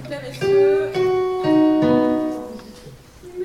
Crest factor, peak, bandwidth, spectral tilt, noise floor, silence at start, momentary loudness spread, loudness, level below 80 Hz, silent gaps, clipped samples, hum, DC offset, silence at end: 14 dB; -6 dBFS; 12.5 kHz; -7 dB/octave; -42 dBFS; 0 s; 17 LU; -18 LUFS; -50 dBFS; none; under 0.1%; none; under 0.1%; 0 s